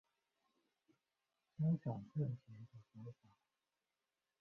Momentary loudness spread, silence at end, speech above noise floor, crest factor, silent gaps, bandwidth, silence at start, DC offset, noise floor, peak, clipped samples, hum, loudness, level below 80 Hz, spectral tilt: 20 LU; 1.25 s; over 46 dB; 18 dB; none; 3.2 kHz; 1.6 s; under 0.1%; under -90 dBFS; -30 dBFS; under 0.1%; none; -43 LUFS; -82 dBFS; -11.5 dB/octave